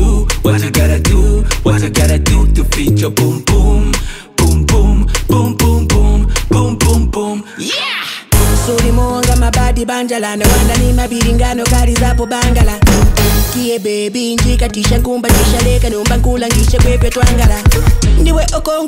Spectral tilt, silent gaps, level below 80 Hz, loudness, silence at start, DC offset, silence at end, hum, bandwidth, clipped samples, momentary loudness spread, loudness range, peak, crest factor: -5 dB/octave; none; -12 dBFS; -12 LUFS; 0 s; under 0.1%; 0 s; none; 16.5 kHz; under 0.1%; 5 LU; 2 LU; 0 dBFS; 10 dB